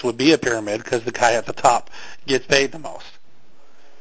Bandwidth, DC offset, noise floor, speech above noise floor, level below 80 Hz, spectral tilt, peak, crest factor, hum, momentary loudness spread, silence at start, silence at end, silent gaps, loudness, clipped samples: 8 kHz; 2%; -57 dBFS; 37 dB; -54 dBFS; -3.5 dB/octave; 0 dBFS; 20 dB; none; 18 LU; 0 s; 0.9 s; none; -19 LUFS; under 0.1%